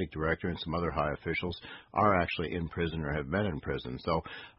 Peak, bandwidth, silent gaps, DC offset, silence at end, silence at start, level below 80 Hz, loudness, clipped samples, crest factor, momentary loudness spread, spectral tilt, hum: -12 dBFS; 5.8 kHz; none; under 0.1%; 0.1 s; 0 s; -46 dBFS; -32 LUFS; under 0.1%; 22 dB; 9 LU; -10 dB/octave; none